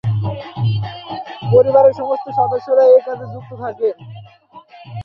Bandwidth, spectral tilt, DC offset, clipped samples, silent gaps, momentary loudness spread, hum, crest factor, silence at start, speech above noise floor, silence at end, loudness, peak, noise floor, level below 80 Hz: 5.8 kHz; -9 dB/octave; under 0.1%; under 0.1%; none; 18 LU; none; 16 dB; 0.05 s; 29 dB; 0 s; -15 LUFS; -2 dBFS; -43 dBFS; -50 dBFS